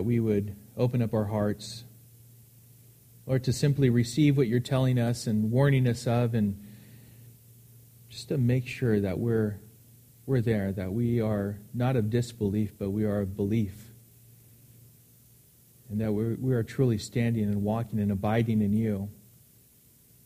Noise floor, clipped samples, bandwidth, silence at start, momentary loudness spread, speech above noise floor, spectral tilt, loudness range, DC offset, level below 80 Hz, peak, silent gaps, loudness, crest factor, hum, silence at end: -59 dBFS; under 0.1%; 15.5 kHz; 0 s; 11 LU; 32 dB; -7.5 dB/octave; 7 LU; under 0.1%; -56 dBFS; -12 dBFS; none; -28 LUFS; 18 dB; none; 1.15 s